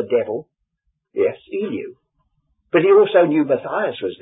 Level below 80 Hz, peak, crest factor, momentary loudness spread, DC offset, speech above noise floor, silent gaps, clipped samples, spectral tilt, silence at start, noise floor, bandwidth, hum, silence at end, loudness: -66 dBFS; -2 dBFS; 18 dB; 17 LU; under 0.1%; 55 dB; none; under 0.1%; -11 dB/octave; 0 s; -73 dBFS; 4 kHz; none; 0.05 s; -18 LUFS